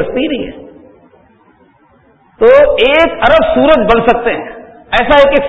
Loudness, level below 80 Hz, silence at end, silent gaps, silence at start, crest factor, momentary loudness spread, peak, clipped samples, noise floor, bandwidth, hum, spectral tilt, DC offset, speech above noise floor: -9 LUFS; -32 dBFS; 0 s; none; 0 s; 10 dB; 13 LU; 0 dBFS; 0.4%; -48 dBFS; 8 kHz; none; -6 dB/octave; under 0.1%; 39 dB